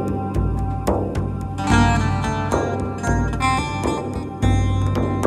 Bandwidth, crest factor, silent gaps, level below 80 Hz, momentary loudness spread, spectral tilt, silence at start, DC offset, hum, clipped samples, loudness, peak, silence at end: 12 kHz; 18 dB; none; -28 dBFS; 7 LU; -6.5 dB/octave; 0 s; under 0.1%; none; under 0.1%; -21 LUFS; -2 dBFS; 0 s